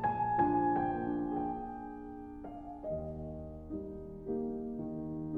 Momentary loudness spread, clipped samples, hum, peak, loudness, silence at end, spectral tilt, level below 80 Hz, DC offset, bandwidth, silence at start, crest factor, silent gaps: 16 LU; under 0.1%; none; -18 dBFS; -37 LUFS; 0 s; -10.5 dB/octave; -54 dBFS; under 0.1%; 3.8 kHz; 0 s; 18 dB; none